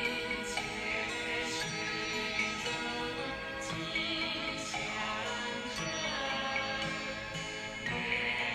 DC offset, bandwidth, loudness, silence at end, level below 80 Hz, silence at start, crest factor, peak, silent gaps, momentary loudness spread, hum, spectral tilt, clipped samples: under 0.1%; 16 kHz; -34 LUFS; 0 s; -58 dBFS; 0 s; 18 dB; -18 dBFS; none; 5 LU; none; -2.5 dB/octave; under 0.1%